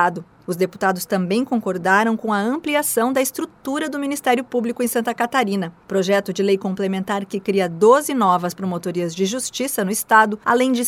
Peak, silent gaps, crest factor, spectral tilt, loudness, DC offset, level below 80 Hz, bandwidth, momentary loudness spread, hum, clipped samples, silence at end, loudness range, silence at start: 0 dBFS; none; 20 dB; -4.5 dB/octave; -20 LUFS; under 0.1%; -64 dBFS; 16.5 kHz; 9 LU; none; under 0.1%; 0 s; 3 LU; 0 s